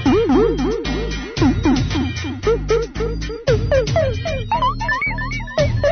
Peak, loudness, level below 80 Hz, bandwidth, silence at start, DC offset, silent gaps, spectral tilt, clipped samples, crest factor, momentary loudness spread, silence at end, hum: -4 dBFS; -19 LUFS; -28 dBFS; 6.6 kHz; 0 s; under 0.1%; none; -6.5 dB/octave; under 0.1%; 14 dB; 8 LU; 0 s; none